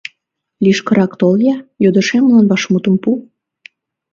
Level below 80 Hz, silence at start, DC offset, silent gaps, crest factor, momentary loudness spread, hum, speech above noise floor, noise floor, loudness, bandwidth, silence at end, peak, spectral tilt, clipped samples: -58 dBFS; 0.6 s; under 0.1%; none; 14 dB; 6 LU; none; 55 dB; -67 dBFS; -13 LUFS; 7.6 kHz; 0.9 s; 0 dBFS; -6.5 dB/octave; under 0.1%